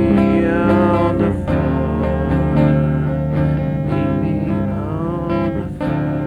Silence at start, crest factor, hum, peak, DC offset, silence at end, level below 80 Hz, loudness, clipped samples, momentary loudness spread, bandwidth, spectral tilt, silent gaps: 0 s; 14 dB; 50 Hz at -25 dBFS; -2 dBFS; under 0.1%; 0 s; -30 dBFS; -17 LUFS; under 0.1%; 7 LU; 5 kHz; -10 dB/octave; none